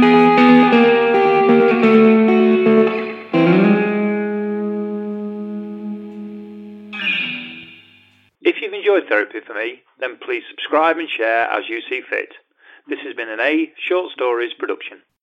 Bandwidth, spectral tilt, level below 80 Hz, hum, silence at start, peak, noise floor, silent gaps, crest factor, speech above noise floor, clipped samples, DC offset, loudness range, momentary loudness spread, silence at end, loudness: 6 kHz; -7.5 dB/octave; -68 dBFS; none; 0 s; 0 dBFS; -53 dBFS; none; 16 dB; 32 dB; under 0.1%; under 0.1%; 11 LU; 18 LU; 0.25 s; -16 LUFS